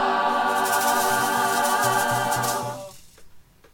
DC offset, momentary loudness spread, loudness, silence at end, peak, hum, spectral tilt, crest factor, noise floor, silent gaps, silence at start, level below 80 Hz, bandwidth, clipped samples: under 0.1%; 9 LU; -22 LUFS; 0.3 s; -10 dBFS; none; -2.5 dB/octave; 14 dB; -47 dBFS; none; 0 s; -58 dBFS; 19 kHz; under 0.1%